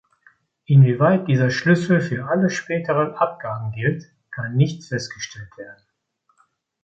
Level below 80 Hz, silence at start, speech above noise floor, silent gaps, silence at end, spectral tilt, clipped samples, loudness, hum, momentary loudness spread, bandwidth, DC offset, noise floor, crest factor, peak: -60 dBFS; 0.7 s; 49 dB; none; 1.1 s; -7 dB/octave; under 0.1%; -20 LUFS; none; 18 LU; 7.8 kHz; under 0.1%; -68 dBFS; 18 dB; -4 dBFS